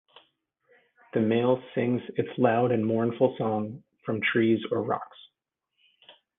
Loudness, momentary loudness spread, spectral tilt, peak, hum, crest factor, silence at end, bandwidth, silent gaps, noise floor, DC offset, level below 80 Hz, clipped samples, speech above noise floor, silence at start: -27 LUFS; 9 LU; -10 dB/octave; -8 dBFS; none; 20 dB; 0.25 s; 3.9 kHz; none; -82 dBFS; under 0.1%; -70 dBFS; under 0.1%; 56 dB; 1.15 s